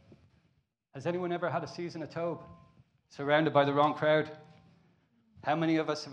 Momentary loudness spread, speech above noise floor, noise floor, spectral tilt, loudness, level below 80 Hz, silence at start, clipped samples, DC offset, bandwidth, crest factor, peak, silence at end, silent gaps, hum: 13 LU; 43 dB; -74 dBFS; -6.5 dB/octave; -31 LUFS; -76 dBFS; 0.95 s; under 0.1%; under 0.1%; 9 kHz; 22 dB; -10 dBFS; 0 s; none; none